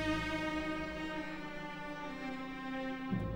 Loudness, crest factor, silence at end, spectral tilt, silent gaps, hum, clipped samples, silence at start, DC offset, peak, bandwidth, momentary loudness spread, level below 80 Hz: -40 LUFS; 16 dB; 0 s; -6 dB/octave; none; none; under 0.1%; 0 s; under 0.1%; -22 dBFS; 16.5 kHz; 7 LU; -54 dBFS